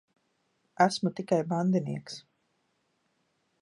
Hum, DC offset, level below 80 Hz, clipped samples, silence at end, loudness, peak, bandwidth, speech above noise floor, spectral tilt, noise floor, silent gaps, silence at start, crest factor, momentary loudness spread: none; under 0.1%; -76 dBFS; under 0.1%; 1.4 s; -29 LUFS; -8 dBFS; 11.5 kHz; 47 dB; -6 dB/octave; -75 dBFS; none; 0.8 s; 24 dB; 15 LU